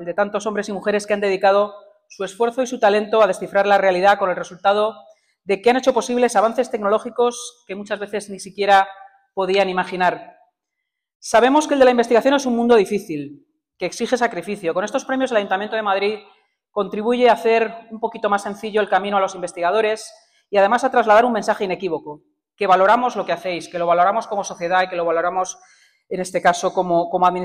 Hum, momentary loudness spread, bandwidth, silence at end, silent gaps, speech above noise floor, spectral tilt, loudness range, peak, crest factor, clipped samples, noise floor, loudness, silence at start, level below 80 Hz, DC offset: none; 13 LU; 15 kHz; 0 s; 11.15-11.20 s; 61 dB; -4 dB/octave; 4 LU; -4 dBFS; 16 dB; under 0.1%; -80 dBFS; -19 LUFS; 0 s; -62 dBFS; under 0.1%